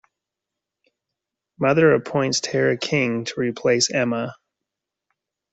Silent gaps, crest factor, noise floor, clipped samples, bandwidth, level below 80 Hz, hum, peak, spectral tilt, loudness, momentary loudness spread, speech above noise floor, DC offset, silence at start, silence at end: none; 18 dB; -85 dBFS; under 0.1%; 8.2 kHz; -64 dBFS; 50 Hz at -60 dBFS; -6 dBFS; -4 dB/octave; -20 LUFS; 8 LU; 65 dB; under 0.1%; 1.6 s; 1.2 s